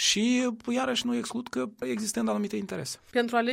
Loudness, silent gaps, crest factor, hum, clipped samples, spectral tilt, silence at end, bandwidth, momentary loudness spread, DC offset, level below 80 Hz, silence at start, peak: -29 LUFS; none; 16 dB; none; under 0.1%; -3 dB/octave; 0 s; 16 kHz; 8 LU; under 0.1%; -66 dBFS; 0 s; -12 dBFS